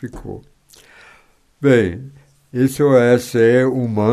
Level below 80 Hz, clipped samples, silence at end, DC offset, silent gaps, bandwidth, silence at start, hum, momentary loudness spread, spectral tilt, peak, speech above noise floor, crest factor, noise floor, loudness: -48 dBFS; under 0.1%; 0 s; under 0.1%; none; 14 kHz; 0 s; none; 20 LU; -7 dB/octave; 0 dBFS; 37 dB; 16 dB; -52 dBFS; -15 LUFS